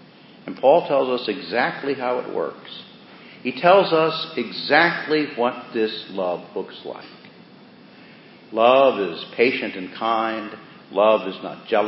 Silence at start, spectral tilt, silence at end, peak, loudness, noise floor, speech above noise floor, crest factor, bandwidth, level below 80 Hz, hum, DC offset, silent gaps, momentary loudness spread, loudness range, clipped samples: 0.45 s; -9.5 dB/octave; 0 s; 0 dBFS; -21 LUFS; -47 dBFS; 26 dB; 22 dB; 5.8 kHz; -74 dBFS; none; under 0.1%; none; 18 LU; 5 LU; under 0.1%